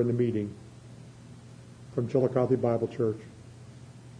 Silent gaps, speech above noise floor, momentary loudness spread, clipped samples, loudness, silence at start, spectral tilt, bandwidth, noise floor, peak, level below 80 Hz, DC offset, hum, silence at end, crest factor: none; 21 dB; 23 LU; under 0.1%; -29 LUFS; 0 s; -9 dB/octave; 10.5 kHz; -48 dBFS; -12 dBFS; -64 dBFS; under 0.1%; none; 0 s; 18 dB